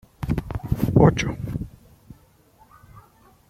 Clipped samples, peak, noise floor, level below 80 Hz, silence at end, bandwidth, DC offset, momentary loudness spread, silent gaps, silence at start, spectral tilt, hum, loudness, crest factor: under 0.1%; -2 dBFS; -56 dBFS; -38 dBFS; 0.5 s; 15.5 kHz; under 0.1%; 15 LU; none; 0.2 s; -7.5 dB/octave; none; -22 LUFS; 22 dB